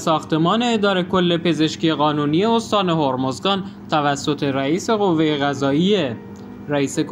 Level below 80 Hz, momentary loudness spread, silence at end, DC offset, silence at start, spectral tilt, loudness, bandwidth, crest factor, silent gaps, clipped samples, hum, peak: -56 dBFS; 5 LU; 0 s; under 0.1%; 0 s; -5.5 dB/octave; -19 LUFS; 15 kHz; 16 dB; none; under 0.1%; none; -2 dBFS